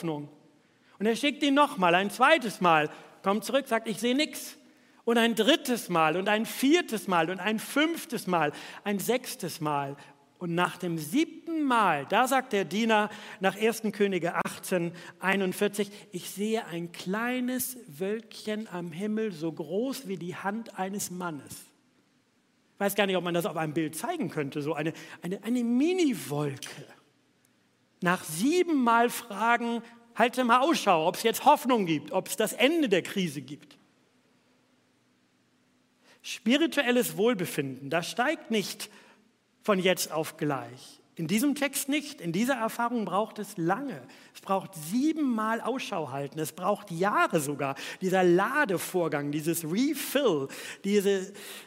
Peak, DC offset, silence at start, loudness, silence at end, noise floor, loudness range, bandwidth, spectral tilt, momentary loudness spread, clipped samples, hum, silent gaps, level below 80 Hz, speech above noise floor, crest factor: -6 dBFS; under 0.1%; 0 s; -28 LUFS; 0 s; -68 dBFS; 7 LU; 16 kHz; -4.5 dB/octave; 12 LU; under 0.1%; none; none; -80 dBFS; 40 dB; 22 dB